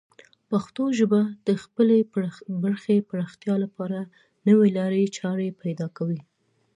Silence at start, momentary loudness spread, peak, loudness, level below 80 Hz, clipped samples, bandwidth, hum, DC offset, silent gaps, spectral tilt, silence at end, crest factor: 0.5 s; 11 LU; -8 dBFS; -24 LUFS; -72 dBFS; under 0.1%; 9.6 kHz; none; under 0.1%; none; -7.5 dB/octave; 0.55 s; 16 dB